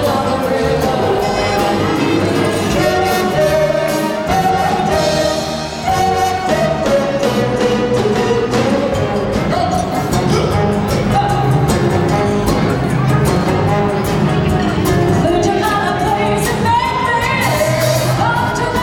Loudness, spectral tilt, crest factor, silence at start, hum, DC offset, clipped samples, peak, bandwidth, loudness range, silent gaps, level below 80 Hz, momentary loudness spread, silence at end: -15 LUFS; -5.5 dB/octave; 14 dB; 0 s; none; under 0.1%; under 0.1%; 0 dBFS; 18.5 kHz; 1 LU; none; -32 dBFS; 2 LU; 0 s